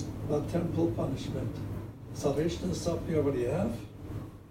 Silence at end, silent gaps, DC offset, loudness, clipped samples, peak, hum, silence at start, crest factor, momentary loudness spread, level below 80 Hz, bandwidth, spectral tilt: 0 s; none; under 0.1%; -33 LUFS; under 0.1%; -16 dBFS; none; 0 s; 16 dB; 12 LU; -48 dBFS; 16 kHz; -7 dB/octave